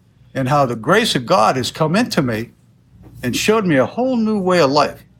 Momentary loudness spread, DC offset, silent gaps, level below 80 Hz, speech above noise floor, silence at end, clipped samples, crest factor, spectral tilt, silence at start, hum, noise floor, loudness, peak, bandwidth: 9 LU; under 0.1%; none; -50 dBFS; 31 dB; 0.2 s; under 0.1%; 16 dB; -5 dB/octave; 0.35 s; none; -47 dBFS; -16 LUFS; -2 dBFS; 17 kHz